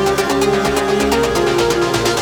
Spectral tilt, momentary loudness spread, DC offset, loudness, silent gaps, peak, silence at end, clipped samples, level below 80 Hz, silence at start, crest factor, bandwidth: -4 dB/octave; 1 LU; under 0.1%; -15 LUFS; none; -2 dBFS; 0 s; under 0.1%; -34 dBFS; 0 s; 14 dB; 20 kHz